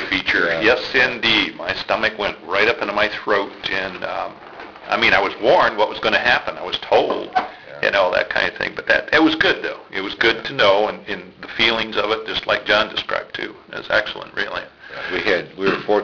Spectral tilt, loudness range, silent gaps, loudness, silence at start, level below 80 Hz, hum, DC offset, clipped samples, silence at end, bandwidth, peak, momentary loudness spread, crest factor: -4 dB/octave; 3 LU; none; -18 LUFS; 0 s; -50 dBFS; none; under 0.1%; under 0.1%; 0 s; 5.4 kHz; -6 dBFS; 13 LU; 14 dB